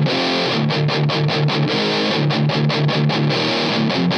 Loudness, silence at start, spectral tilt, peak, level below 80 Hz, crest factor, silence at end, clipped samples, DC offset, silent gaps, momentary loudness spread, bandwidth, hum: -17 LUFS; 0 s; -6 dB/octave; -6 dBFS; -58 dBFS; 12 dB; 0 s; under 0.1%; under 0.1%; none; 1 LU; 8.2 kHz; none